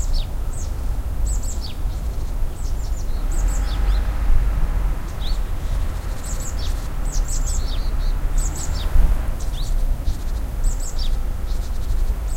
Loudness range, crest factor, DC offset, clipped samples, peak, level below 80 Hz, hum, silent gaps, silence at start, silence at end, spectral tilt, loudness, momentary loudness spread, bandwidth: 2 LU; 16 dB; under 0.1%; under 0.1%; -2 dBFS; -20 dBFS; none; none; 0 s; 0 s; -4.5 dB/octave; -26 LUFS; 6 LU; 16 kHz